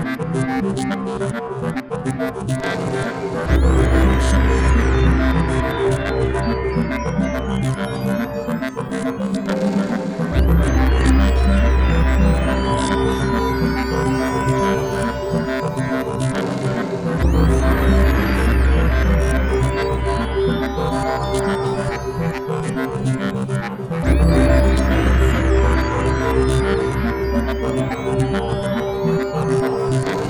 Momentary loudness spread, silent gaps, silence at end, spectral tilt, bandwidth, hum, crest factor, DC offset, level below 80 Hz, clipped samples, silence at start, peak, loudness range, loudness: 7 LU; none; 0 s; -7 dB/octave; 13.5 kHz; none; 14 dB; under 0.1%; -22 dBFS; under 0.1%; 0 s; -2 dBFS; 4 LU; -19 LUFS